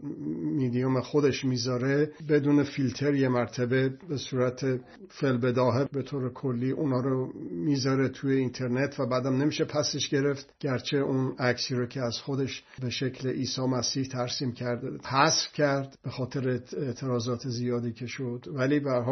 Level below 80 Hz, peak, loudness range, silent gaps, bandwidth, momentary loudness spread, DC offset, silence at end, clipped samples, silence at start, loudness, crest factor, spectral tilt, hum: -66 dBFS; -6 dBFS; 3 LU; none; 6.4 kHz; 8 LU; under 0.1%; 0 s; under 0.1%; 0 s; -29 LUFS; 22 dB; -5.5 dB/octave; none